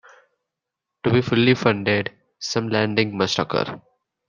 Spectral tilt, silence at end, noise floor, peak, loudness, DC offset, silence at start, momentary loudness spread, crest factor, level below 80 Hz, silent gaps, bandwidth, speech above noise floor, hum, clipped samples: -5.5 dB/octave; 0.5 s; -84 dBFS; -2 dBFS; -21 LUFS; under 0.1%; 1.05 s; 12 LU; 22 dB; -58 dBFS; none; 9.4 kHz; 63 dB; none; under 0.1%